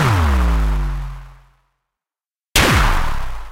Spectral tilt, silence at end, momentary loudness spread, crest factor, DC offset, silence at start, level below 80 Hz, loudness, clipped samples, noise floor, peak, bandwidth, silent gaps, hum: -4 dB/octave; 0 s; 15 LU; 18 dB; under 0.1%; 0 s; -20 dBFS; -17 LUFS; under 0.1%; under -90 dBFS; 0 dBFS; 16 kHz; none; none